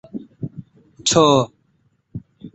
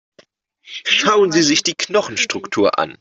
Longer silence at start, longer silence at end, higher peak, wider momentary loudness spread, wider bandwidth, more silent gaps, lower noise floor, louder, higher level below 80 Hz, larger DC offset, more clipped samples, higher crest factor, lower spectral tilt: second, 0.15 s vs 0.7 s; about the same, 0.05 s vs 0.05 s; about the same, -2 dBFS vs -2 dBFS; first, 24 LU vs 7 LU; about the same, 8.4 kHz vs 8 kHz; neither; first, -63 dBFS vs -54 dBFS; about the same, -17 LUFS vs -16 LUFS; first, -54 dBFS vs -60 dBFS; neither; neither; about the same, 18 dB vs 16 dB; first, -4 dB/octave vs -2.5 dB/octave